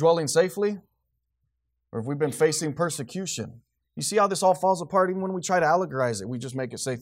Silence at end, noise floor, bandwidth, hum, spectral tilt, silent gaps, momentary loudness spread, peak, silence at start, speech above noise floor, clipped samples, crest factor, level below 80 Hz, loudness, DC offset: 0 s; -77 dBFS; 16 kHz; none; -4.5 dB/octave; none; 11 LU; -8 dBFS; 0 s; 53 dB; under 0.1%; 16 dB; -68 dBFS; -25 LUFS; under 0.1%